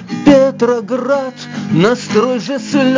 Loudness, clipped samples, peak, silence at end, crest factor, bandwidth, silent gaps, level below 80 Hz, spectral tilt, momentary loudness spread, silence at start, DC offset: -13 LUFS; under 0.1%; 0 dBFS; 0 s; 12 dB; 7.6 kHz; none; -48 dBFS; -6 dB/octave; 9 LU; 0 s; under 0.1%